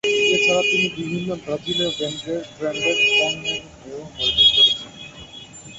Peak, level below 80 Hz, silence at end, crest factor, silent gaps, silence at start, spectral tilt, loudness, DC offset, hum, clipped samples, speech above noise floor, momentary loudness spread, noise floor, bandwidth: -2 dBFS; -50 dBFS; 0 s; 18 dB; none; 0.05 s; -2.5 dB/octave; -18 LUFS; under 0.1%; none; under 0.1%; 18 dB; 23 LU; -40 dBFS; 8.2 kHz